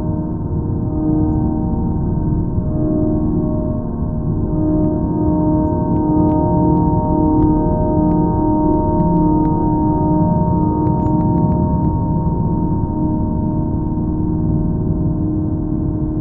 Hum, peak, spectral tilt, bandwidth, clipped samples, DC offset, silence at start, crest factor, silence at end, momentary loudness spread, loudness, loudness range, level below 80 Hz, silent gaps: none; -2 dBFS; -15 dB/octave; 1.8 kHz; under 0.1%; under 0.1%; 0 s; 12 dB; 0 s; 5 LU; -17 LUFS; 3 LU; -26 dBFS; none